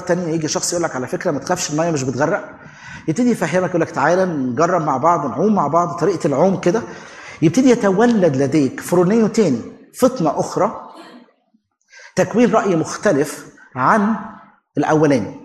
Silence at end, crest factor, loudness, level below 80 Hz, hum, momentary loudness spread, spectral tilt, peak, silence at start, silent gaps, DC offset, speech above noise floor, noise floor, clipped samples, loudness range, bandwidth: 0 s; 16 dB; -17 LUFS; -58 dBFS; none; 11 LU; -5.5 dB/octave; -2 dBFS; 0 s; none; under 0.1%; 46 dB; -63 dBFS; under 0.1%; 4 LU; 13 kHz